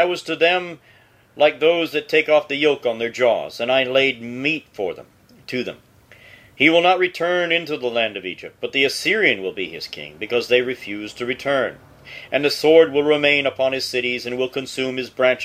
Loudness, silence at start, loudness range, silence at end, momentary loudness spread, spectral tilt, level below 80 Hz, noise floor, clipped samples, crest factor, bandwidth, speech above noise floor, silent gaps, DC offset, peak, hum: -19 LUFS; 0 s; 3 LU; 0 s; 13 LU; -4 dB/octave; -62 dBFS; -47 dBFS; under 0.1%; 20 dB; 15.5 kHz; 28 dB; none; under 0.1%; 0 dBFS; none